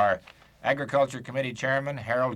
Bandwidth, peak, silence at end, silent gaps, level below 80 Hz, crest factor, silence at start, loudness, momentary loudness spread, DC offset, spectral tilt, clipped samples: 12.5 kHz; -12 dBFS; 0 s; none; -62 dBFS; 16 dB; 0 s; -28 LUFS; 6 LU; under 0.1%; -5.5 dB/octave; under 0.1%